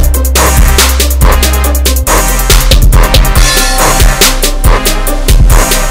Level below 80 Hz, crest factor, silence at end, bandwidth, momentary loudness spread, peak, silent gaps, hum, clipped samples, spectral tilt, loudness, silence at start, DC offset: -8 dBFS; 6 dB; 0 s; over 20 kHz; 3 LU; 0 dBFS; none; none; 6%; -3 dB/octave; -7 LUFS; 0 s; under 0.1%